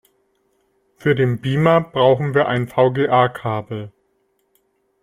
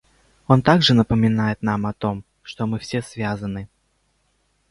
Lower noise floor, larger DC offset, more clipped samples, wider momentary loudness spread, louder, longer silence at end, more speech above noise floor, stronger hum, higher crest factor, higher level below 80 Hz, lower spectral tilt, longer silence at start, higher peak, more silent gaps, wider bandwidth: about the same, -66 dBFS vs -66 dBFS; neither; neither; second, 11 LU vs 17 LU; first, -17 LUFS vs -20 LUFS; about the same, 1.15 s vs 1.05 s; about the same, 49 dB vs 47 dB; neither; about the same, 18 dB vs 20 dB; second, -56 dBFS vs -46 dBFS; first, -8 dB/octave vs -6.5 dB/octave; first, 1 s vs 0.5 s; about the same, -2 dBFS vs 0 dBFS; neither; first, 13.5 kHz vs 11.5 kHz